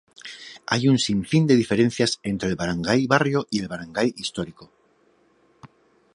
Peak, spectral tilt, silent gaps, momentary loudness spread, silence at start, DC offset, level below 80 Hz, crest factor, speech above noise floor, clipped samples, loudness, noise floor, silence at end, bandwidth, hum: -2 dBFS; -5.5 dB/octave; none; 16 LU; 0.25 s; under 0.1%; -54 dBFS; 22 dB; 40 dB; under 0.1%; -22 LUFS; -61 dBFS; 0.5 s; 11.5 kHz; none